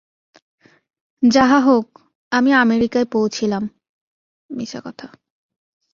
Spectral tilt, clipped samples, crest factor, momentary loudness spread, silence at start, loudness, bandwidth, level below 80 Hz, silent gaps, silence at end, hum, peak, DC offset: -5 dB/octave; under 0.1%; 18 dB; 20 LU; 1.2 s; -17 LUFS; 7.4 kHz; -56 dBFS; 2.15-2.31 s, 3.89-4.49 s; 0.85 s; none; -2 dBFS; under 0.1%